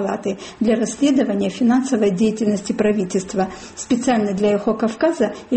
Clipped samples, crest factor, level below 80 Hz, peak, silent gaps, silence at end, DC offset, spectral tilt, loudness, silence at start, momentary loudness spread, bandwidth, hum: under 0.1%; 12 dB; -52 dBFS; -6 dBFS; none; 0 s; under 0.1%; -5.5 dB/octave; -19 LUFS; 0 s; 6 LU; 8.8 kHz; none